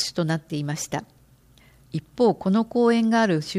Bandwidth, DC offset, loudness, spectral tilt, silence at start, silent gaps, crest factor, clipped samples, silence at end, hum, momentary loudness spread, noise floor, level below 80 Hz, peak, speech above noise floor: 15 kHz; under 0.1%; -23 LUFS; -5.5 dB/octave; 0 s; none; 14 dB; under 0.1%; 0 s; none; 14 LU; -55 dBFS; -60 dBFS; -8 dBFS; 32 dB